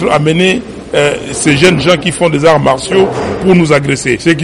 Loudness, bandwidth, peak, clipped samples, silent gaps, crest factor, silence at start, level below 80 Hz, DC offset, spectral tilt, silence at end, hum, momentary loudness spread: -10 LUFS; 11.5 kHz; 0 dBFS; 0.3%; none; 10 dB; 0 s; -36 dBFS; under 0.1%; -5 dB/octave; 0 s; none; 5 LU